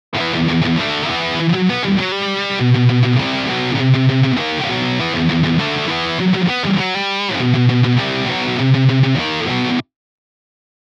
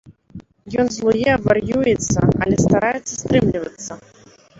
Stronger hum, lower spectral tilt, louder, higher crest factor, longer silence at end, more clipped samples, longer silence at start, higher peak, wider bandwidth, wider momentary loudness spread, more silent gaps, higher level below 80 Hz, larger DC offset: neither; about the same, -6.5 dB/octave vs -5.5 dB/octave; about the same, -16 LUFS vs -18 LUFS; about the same, 14 dB vs 18 dB; first, 1.05 s vs 0.65 s; neither; about the same, 0.1 s vs 0.05 s; about the same, -2 dBFS vs -2 dBFS; about the same, 7.6 kHz vs 8 kHz; second, 5 LU vs 12 LU; neither; second, -46 dBFS vs -40 dBFS; neither